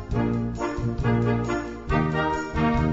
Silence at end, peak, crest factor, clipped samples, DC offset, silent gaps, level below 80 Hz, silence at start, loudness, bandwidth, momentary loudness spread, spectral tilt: 0 s; -10 dBFS; 14 dB; under 0.1%; under 0.1%; none; -34 dBFS; 0 s; -25 LUFS; 7.8 kHz; 5 LU; -7.5 dB/octave